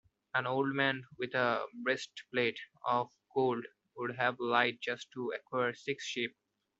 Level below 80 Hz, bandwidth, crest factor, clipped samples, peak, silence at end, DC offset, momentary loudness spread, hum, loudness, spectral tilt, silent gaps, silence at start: -80 dBFS; 8 kHz; 24 dB; under 0.1%; -12 dBFS; 0.5 s; under 0.1%; 10 LU; none; -34 LUFS; -4.5 dB/octave; none; 0.35 s